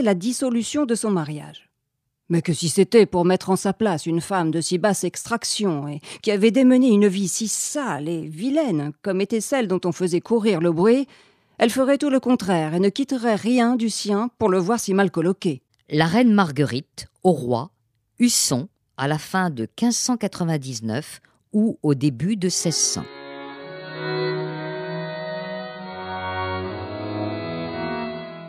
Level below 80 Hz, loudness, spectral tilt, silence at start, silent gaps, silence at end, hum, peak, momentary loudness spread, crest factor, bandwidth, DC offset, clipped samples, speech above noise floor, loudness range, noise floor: -62 dBFS; -22 LUFS; -5 dB/octave; 0 s; none; 0 s; none; -4 dBFS; 13 LU; 18 dB; 15.5 kHz; under 0.1%; under 0.1%; 56 dB; 8 LU; -77 dBFS